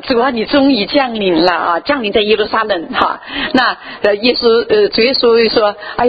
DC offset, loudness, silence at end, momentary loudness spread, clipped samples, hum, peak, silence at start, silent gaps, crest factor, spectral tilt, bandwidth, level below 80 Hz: under 0.1%; -12 LUFS; 0 s; 5 LU; under 0.1%; none; 0 dBFS; 0 s; none; 12 dB; -6.5 dB/octave; 7.4 kHz; -44 dBFS